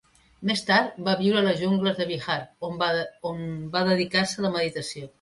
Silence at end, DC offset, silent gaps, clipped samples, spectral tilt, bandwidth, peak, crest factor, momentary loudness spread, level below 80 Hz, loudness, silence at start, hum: 0.15 s; under 0.1%; none; under 0.1%; -5 dB/octave; 11.5 kHz; -8 dBFS; 18 dB; 11 LU; -62 dBFS; -25 LUFS; 0.4 s; none